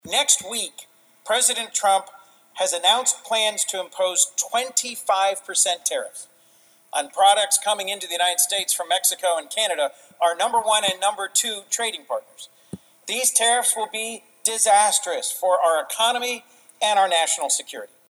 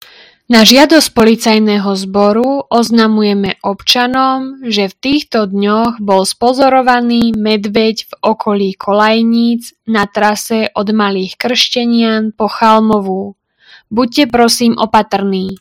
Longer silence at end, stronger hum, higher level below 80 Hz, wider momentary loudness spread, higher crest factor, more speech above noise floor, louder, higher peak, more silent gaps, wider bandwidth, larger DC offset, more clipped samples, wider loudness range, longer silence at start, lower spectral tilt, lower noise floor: first, 0.25 s vs 0.05 s; neither; second, -78 dBFS vs -46 dBFS; first, 11 LU vs 7 LU; first, 20 dB vs 12 dB; about the same, 34 dB vs 33 dB; second, -21 LUFS vs -11 LUFS; about the same, -2 dBFS vs 0 dBFS; neither; about the same, over 20 kHz vs over 20 kHz; neither; second, under 0.1% vs 0.9%; about the same, 3 LU vs 3 LU; second, 0.05 s vs 0.5 s; second, 1 dB/octave vs -4 dB/octave; first, -56 dBFS vs -44 dBFS